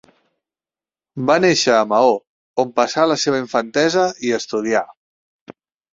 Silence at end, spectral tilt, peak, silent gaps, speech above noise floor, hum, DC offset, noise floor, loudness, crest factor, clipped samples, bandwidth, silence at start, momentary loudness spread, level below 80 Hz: 0.4 s; -4 dB/octave; -2 dBFS; 2.27-2.54 s, 4.97-5.46 s; over 73 dB; none; under 0.1%; under -90 dBFS; -17 LUFS; 18 dB; under 0.1%; 7.8 kHz; 1.15 s; 10 LU; -62 dBFS